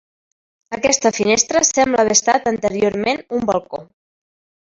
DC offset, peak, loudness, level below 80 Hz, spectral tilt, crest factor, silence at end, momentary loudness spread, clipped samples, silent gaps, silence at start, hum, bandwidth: under 0.1%; -2 dBFS; -16 LUFS; -52 dBFS; -2 dB/octave; 18 dB; 0.85 s; 9 LU; under 0.1%; none; 0.7 s; none; 7.8 kHz